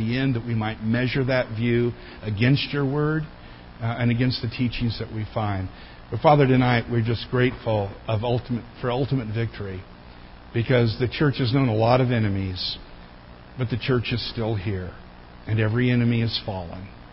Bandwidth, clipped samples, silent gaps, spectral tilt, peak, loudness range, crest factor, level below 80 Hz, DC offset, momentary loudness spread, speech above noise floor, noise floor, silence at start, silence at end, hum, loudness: 5.8 kHz; under 0.1%; none; -11.5 dB/octave; -4 dBFS; 4 LU; 20 dB; -44 dBFS; under 0.1%; 14 LU; 21 dB; -44 dBFS; 0 s; 0 s; none; -24 LUFS